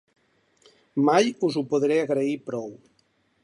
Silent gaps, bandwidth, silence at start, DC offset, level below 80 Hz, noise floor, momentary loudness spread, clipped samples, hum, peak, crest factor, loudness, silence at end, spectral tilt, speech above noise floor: none; 11.5 kHz; 0.95 s; under 0.1%; -74 dBFS; -67 dBFS; 13 LU; under 0.1%; none; -6 dBFS; 20 dB; -24 LUFS; 0.7 s; -5.5 dB/octave; 44 dB